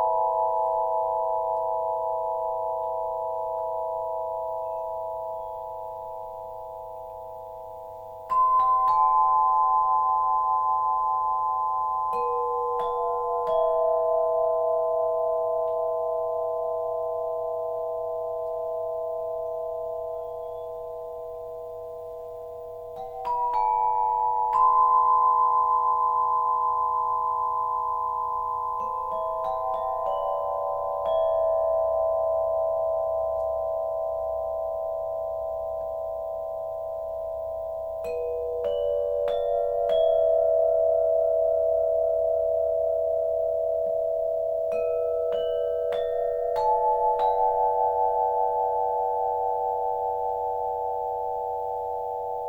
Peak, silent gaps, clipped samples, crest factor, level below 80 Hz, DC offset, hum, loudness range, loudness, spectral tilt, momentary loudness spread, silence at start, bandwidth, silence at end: -12 dBFS; none; under 0.1%; 14 dB; -56 dBFS; under 0.1%; none; 9 LU; -26 LUFS; -5.5 dB/octave; 13 LU; 0 s; 17 kHz; 0 s